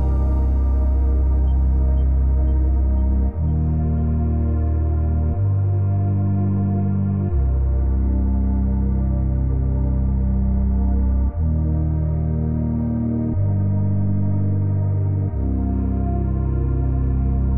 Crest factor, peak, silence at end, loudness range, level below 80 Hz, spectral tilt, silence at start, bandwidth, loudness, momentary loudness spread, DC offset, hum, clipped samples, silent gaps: 8 dB; -10 dBFS; 0 s; 1 LU; -20 dBFS; -13.5 dB/octave; 0 s; 2.2 kHz; -21 LUFS; 2 LU; 0.7%; none; under 0.1%; none